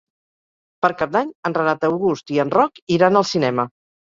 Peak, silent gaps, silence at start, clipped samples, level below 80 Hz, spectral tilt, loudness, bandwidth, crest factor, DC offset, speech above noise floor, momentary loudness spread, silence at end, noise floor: -2 dBFS; 1.35-1.43 s, 2.82-2.87 s; 0.85 s; under 0.1%; -60 dBFS; -6 dB/octave; -19 LUFS; 7.8 kHz; 18 dB; under 0.1%; over 72 dB; 6 LU; 0.45 s; under -90 dBFS